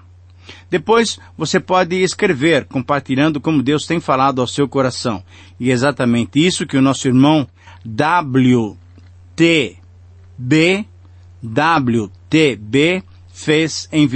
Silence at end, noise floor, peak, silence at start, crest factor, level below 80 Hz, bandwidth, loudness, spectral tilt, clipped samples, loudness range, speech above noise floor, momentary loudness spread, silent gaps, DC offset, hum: 0 s; -42 dBFS; -2 dBFS; 0.5 s; 14 dB; -52 dBFS; 8.8 kHz; -16 LUFS; -5.5 dB/octave; under 0.1%; 2 LU; 27 dB; 10 LU; none; under 0.1%; none